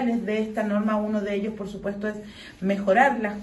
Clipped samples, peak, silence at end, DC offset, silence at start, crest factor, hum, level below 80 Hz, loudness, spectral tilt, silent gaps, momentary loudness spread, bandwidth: under 0.1%; -6 dBFS; 0 s; under 0.1%; 0 s; 20 dB; none; -56 dBFS; -25 LUFS; -7 dB/octave; none; 13 LU; 12 kHz